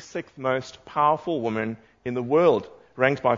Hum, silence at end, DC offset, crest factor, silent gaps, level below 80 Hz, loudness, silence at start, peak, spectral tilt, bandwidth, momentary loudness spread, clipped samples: none; 0 s; under 0.1%; 20 dB; none; -64 dBFS; -24 LUFS; 0 s; -4 dBFS; -6.5 dB/octave; 7.6 kHz; 13 LU; under 0.1%